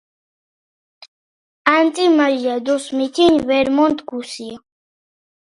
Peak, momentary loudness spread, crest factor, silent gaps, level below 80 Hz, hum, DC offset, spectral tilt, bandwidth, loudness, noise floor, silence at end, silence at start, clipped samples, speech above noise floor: 0 dBFS; 14 LU; 18 dB; none; -56 dBFS; none; under 0.1%; -4 dB/octave; 11.5 kHz; -16 LUFS; under -90 dBFS; 1 s; 1.65 s; under 0.1%; over 74 dB